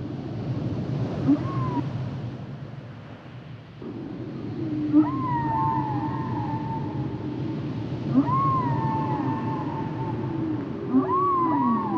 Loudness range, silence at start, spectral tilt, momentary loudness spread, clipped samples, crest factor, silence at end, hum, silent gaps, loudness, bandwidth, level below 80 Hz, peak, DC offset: 4 LU; 0 s; -9.5 dB/octave; 16 LU; under 0.1%; 18 dB; 0 s; none; none; -26 LUFS; 6.6 kHz; -54 dBFS; -8 dBFS; under 0.1%